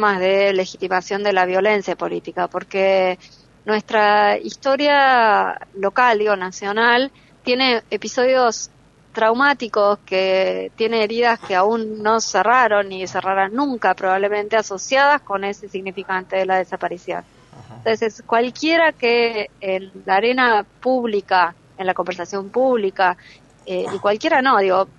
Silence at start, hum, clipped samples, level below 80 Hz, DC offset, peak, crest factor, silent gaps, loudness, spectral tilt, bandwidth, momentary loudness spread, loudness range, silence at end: 0 s; none; under 0.1%; -62 dBFS; under 0.1%; -2 dBFS; 16 dB; none; -18 LUFS; -3.5 dB/octave; 8.2 kHz; 10 LU; 4 LU; 0.15 s